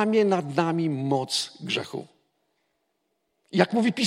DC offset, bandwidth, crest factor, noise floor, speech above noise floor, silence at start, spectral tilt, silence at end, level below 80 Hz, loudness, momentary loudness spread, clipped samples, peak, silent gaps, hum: under 0.1%; 15.5 kHz; 22 dB; -76 dBFS; 51 dB; 0 s; -5 dB/octave; 0 s; -76 dBFS; -25 LUFS; 7 LU; under 0.1%; -4 dBFS; none; none